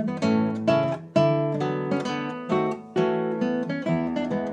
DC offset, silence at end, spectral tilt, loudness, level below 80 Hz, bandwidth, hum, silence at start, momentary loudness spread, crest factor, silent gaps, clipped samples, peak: under 0.1%; 0 s; -7.5 dB/octave; -25 LUFS; -64 dBFS; 9.4 kHz; none; 0 s; 4 LU; 16 dB; none; under 0.1%; -8 dBFS